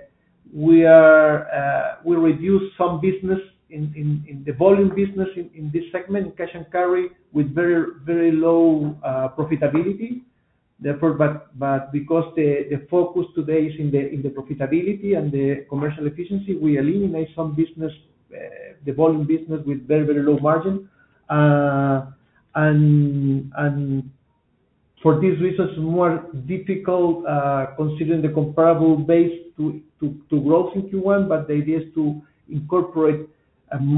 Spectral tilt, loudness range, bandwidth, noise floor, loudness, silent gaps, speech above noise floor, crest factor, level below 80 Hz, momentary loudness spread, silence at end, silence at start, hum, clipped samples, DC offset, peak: -13.5 dB/octave; 4 LU; 4 kHz; -65 dBFS; -20 LUFS; none; 45 dB; 20 dB; -56 dBFS; 12 LU; 0 s; 0.55 s; none; under 0.1%; under 0.1%; 0 dBFS